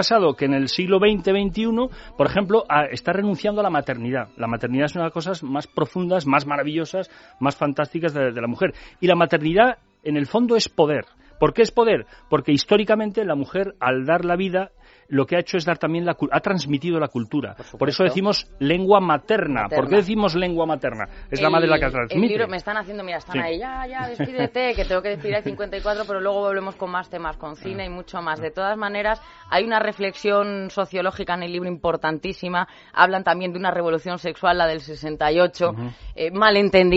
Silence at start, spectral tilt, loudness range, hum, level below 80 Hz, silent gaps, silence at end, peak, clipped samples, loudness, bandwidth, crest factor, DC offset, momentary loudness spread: 0 s; -4 dB/octave; 5 LU; none; -44 dBFS; none; 0 s; 0 dBFS; under 0.1%; -22 LUFS; 8 kHz; 22 dB; under 0.1%; 10 LU